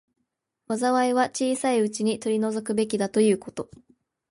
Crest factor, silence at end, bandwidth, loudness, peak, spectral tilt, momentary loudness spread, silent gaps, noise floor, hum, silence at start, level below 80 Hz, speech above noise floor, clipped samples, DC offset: 16 dB; 0.65 s; 11.5 kHz; -24 LUFS; -10 dBFS; -4.5 dB/octave; 10 LU; none; -79 dBFS; none; 0.7 s; -68 dBFS; 55 dB; under 0.1%; under 0.1%